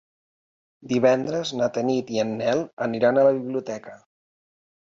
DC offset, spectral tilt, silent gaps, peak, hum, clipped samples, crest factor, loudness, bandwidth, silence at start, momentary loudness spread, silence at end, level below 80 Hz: under 0.1%; -5.5 dB/octave; 2.73-2.77 s; -6 dBFS; none; under 0.1%; 18 dB; -23 LUFS; 7.6 kHz; 0.8 s; 10 LU; 1 s; -68 dBFS